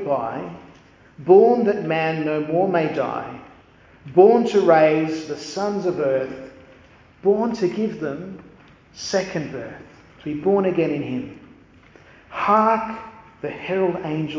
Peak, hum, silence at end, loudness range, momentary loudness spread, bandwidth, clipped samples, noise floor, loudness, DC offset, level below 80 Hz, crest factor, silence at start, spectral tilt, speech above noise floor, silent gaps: -2 dBFS; none; 0 s; 7 LU; 21 LU; 7.6 kHz; under 0.1%; -50 dBFS; -20 LUFS; under 0.1%; -58 dBFS; 20 dB; 0 s; -6.5 dB/octave; 30 dB; none